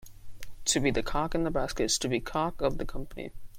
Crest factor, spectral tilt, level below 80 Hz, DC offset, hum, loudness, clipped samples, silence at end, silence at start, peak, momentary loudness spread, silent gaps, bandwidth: 18 dB; -3.5 dB/octave; -40 dBFS; under 0.1%; none; -30 LUFS; under 0.1%; 0 s; 0 s; -12 dBFS; 13 LU; none; 16.5 kHz